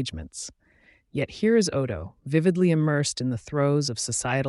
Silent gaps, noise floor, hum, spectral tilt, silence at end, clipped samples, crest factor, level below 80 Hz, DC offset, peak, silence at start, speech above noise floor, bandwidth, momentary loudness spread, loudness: none; -60 dBFS; none; -5 dB/octave; 0 s; under 0.1%; 16 dB; -52 dBFS; under 0.1%; -8 dBFS; 0 s; 36 dB; 11.5 kHz; 14 LU; -25 LUFS